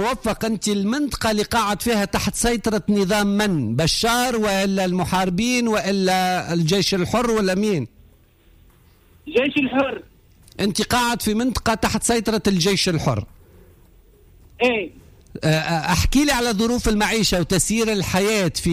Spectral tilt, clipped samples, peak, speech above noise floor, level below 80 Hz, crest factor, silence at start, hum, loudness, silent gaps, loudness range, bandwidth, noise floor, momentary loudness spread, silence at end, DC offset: -4 dB/octave; under 0.1%; -6 dBFS; 33 dB; -38 dBFS; 14 dB; 0 s; none; -20 LUFS; none; 4 LU; 16 kHz; -53 dBFS; 5 LU; 0 s; under 0.1%